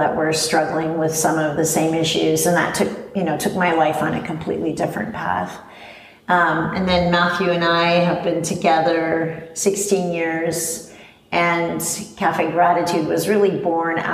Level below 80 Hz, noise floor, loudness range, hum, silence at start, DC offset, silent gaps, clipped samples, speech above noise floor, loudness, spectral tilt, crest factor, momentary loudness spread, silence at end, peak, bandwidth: -50 dBFS; -41 dBFS; 3 LU; none; 0 s; under 0.1%; none; under 0.1%; 23 dB; -19 LUFS; -4 dB/octave; 16 dB; 7 LU; 0 s; -4 dBFS; 15.5 kHz